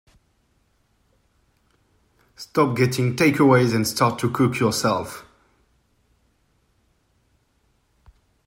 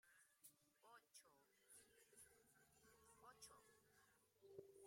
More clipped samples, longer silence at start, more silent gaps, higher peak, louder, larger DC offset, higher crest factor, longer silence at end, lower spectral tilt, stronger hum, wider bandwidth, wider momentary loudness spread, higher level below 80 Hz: neither; first, 2.4 s vs 0.05 s; neither; first, -2 dBFS vs -46 dBFS; first, -20 LUFS vs -68 LUFS; neither; about the same, 22 dB vs 24 dB; first, 3.25 s vs 0 s; first, -5.5 dB/octave vs -2 dB/octave; neither; about the same, 16 kHz vs 16 kHz; first, 11 LU vs 4 LU; first, -60 dBFS vs under -90 dBFS